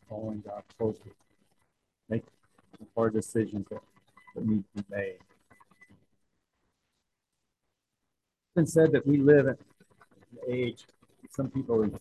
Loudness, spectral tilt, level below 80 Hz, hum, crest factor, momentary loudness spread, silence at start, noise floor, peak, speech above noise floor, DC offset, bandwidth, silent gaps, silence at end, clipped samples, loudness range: -29 LUFS; -7.5 dB/octave; -62 dBFS; none; 22 dB; 19 LU; 0.1 s; -84 dBFS; -8 dBFS; 56 dB; under 0.1%; 12.5 kHz; none; 0 s; under 0.1%; 11 LU